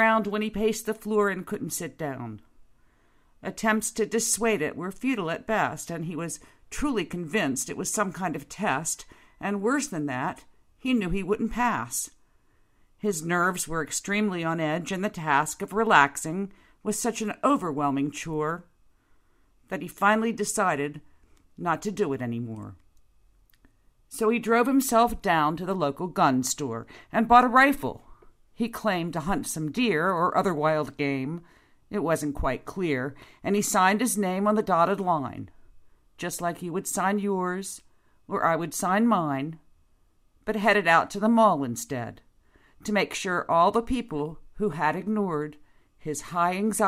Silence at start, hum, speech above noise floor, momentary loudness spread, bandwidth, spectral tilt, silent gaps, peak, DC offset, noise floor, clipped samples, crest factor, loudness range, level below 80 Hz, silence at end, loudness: 0 s; none; 36 dB; 13 LU; 16 kHz; -4.5 dB/octave; none; -4 dBFS; under 0.1%; -62 dBFS; under 0.1%; 24 dB; 6 LU; -52 dBFS; 0 s; -26 LUFS